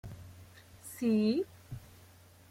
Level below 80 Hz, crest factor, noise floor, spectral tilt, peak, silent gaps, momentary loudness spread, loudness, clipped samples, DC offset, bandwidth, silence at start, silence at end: -64 dBFS; 16 dB; -58 dBFS; -6.5 dB/octave; -20 dBFS; none; 24 LU; -32 LUFS; under 0.1%; under 0.1%; 16 kHz; 0.05 s; 0.65 s